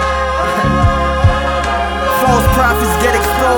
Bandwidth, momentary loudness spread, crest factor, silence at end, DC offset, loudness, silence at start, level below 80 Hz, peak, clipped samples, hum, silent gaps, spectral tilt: over 20 kHz; 4 LU; 12 dB; 0 s; under 0.1%; -13 LUFS; 0 s; -20 dBFS; 0 dBFS; under 0.1%; none; none; -5 dB/octave